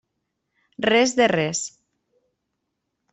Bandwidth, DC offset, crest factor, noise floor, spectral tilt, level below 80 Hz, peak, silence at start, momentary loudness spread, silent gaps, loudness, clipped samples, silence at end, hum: 8.4 kHz; under 0.1%; 18 dB; -78 dBFS; -3.5 dB/octave; -64 dBFS; -6 dBFS; 0.8 s; 11 LU; none; -20 LUFS; under 0.1%; 1.45 s; none